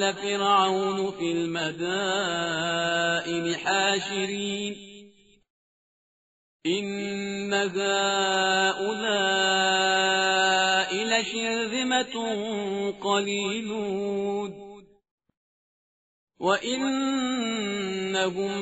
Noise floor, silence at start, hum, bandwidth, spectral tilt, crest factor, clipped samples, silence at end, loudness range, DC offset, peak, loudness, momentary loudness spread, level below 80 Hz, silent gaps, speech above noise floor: -54 dBFS; 0 s; none; 8 kHz; -1.5 dB/octave; 18 dB; under 0.1%; 0 s; 9 LU; under 0.1%; -8 dBFS; -25 LUFS; 8 LU; -68 dBFS; 5.50-6.60 s, 15.11-15.18 s, 15.37-16.27 s; 28 dB